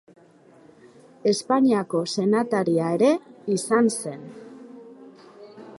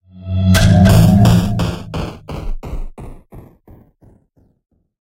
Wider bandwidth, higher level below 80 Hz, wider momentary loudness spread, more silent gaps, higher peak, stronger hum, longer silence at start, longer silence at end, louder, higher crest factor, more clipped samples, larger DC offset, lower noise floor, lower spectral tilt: second, 11.5 kHz vs 16.5 kHz; second, -74 dBFS vs -26 dBFS; about the same, 23 LU vs 21 LU; neither; second, -8 dBFS vs 0 dBFS; neither; first, 1.25 s vs 0.15 s; second, 0 s vs 1.65 s; second, -22 LUFS vs -13 LUFS; about the same, 18 dB vs 14 dB; neither; neither; about the same, -53 dBFS vs -55 dBFS; second, -5 dB/octave vs -6.5 dB/octave